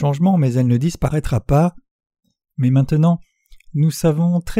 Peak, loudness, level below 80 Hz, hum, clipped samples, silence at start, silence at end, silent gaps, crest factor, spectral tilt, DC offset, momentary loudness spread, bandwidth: -4 dBFS; -18 LUFS; -36 dBFS; none; under 0.1%; 0 s; 0 s; 1.91-1.99 s; 14 dB; -8 dB/octave; under 0.1%; 6 LU; 15 kHz